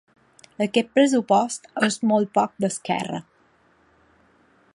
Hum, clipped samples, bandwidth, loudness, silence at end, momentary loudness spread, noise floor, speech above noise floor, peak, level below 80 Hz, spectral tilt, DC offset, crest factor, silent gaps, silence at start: none; under 0.1%; 11.5 kHz; -22 LUFS; 1.55 s; 9 LU; -60 dBFS; 39 dB; -4 dBFS; -70 dBFS; -4.5 dB/octave; under 0.1%; 20 dB; none; 0.6 s